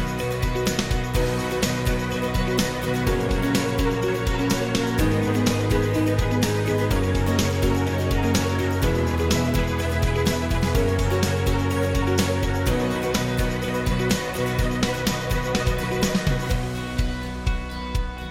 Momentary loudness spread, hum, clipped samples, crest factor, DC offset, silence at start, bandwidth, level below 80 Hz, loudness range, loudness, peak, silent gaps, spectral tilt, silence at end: 3 LU; none; under 0.1%; 14 dB; under 0.1%; 0 s; 17 kHz; -30 dBFS; 2 LU; -23 LUFS; -8 dBFS; none; -5.5 dB/octave; 0 s